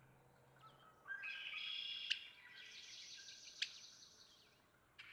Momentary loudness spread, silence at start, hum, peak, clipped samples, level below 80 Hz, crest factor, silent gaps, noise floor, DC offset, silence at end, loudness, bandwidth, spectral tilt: 21 LU; 0 s; none; -22 dBFS; under 0.1%; -88 dBFS; 30 dB; none; -73 dBFS; under 0.1%; 0 s; -48 LUFS; over 20 kHz; 1 dB/octave